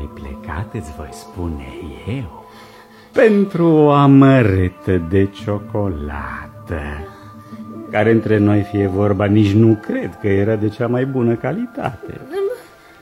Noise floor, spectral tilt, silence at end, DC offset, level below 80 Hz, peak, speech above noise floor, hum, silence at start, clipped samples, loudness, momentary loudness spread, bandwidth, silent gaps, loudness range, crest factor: -35 dBFS; -8.5 dB/octave; 0.4 s; under 0.1%; -38 dBFS; 0 dBFS; 19 dB; none; 0 s; under 0.1%; -16 LUFS; 20 LU; 12.5 kHz; none; 8 LU; 16 dB